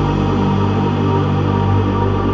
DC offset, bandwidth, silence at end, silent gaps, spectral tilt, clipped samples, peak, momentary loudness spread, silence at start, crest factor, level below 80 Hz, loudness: under 0.1%; 6.6 kHz; 0 s; none; -8.5 dB/octave; under 0.1%; -4 dBFS; 1 LU; 0 s; 12 dB; -30 dBFS; -16 LUFS